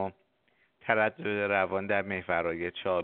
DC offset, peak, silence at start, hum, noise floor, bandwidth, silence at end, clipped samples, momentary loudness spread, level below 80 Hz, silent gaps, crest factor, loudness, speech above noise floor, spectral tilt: under 0.1%; -8 dBFS; 0 s; none; -71 dBFS; 4.4 kHz; 0 s; under 0.1%; 6 LU; -66 dBFS; none; 22 dB; -30 LUFS; 41 dB; -3.5 dB/octave